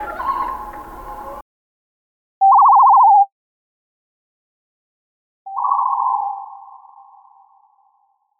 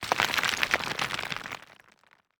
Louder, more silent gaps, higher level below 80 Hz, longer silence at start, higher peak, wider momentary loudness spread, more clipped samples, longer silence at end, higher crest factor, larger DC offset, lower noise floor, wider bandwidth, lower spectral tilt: first, -14 LUFS vs -27 LUFS; first, 1.42-2.41 s, 3.32-5.45 s vs none; first, -50 dBFS vs -62 dBFS; about the same, 0 s vs 0 s; about the same, -4 dBFS vs -2 dBFS; first, 24 LU vs 13 LU; neither; first, 1.85 s vs 0.8 s; second, 14 dB vs 28 dB; neither; about the same, -63 dBFS vs -63 dBFS; second, 15.5 kHz vs over 20 kHz; first, -5 dB/octave vs -1.5 dB/octave